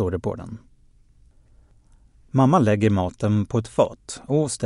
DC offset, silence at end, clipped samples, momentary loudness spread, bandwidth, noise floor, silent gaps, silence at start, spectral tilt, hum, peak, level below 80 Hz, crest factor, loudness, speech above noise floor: under 0.1%; 0 s; under 0.1%; 18 LU; 11.5 kHz; -54 dBFS; none; 0 s; -7 dB/octave; none; -4 dBFS; -50 dBFS; 18 dB; -22 LUFS; 33 dB